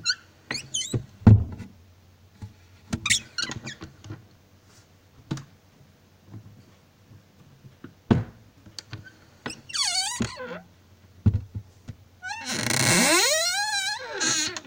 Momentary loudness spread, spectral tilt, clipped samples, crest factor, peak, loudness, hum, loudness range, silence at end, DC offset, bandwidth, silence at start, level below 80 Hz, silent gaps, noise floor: 27 LU; -3.5 dB/octave; under 0.1%; 26 dB; -2 dBFS; -24 LUFS; none; 21 LU; 0.05 s; under 0.1%; 16.5 kHz; 0 s; -44 dBFS; none; -56 dBFS